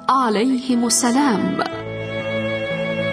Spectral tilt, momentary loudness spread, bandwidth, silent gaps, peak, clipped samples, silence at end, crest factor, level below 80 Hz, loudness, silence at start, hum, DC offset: -4 dB/octave; 9 LU; 11 kHz; none; -4 dBFS; under 0.1%; 0 s; 16 dB; -54 dBFS; -19 LUFS; 0 s; none; under 0.1%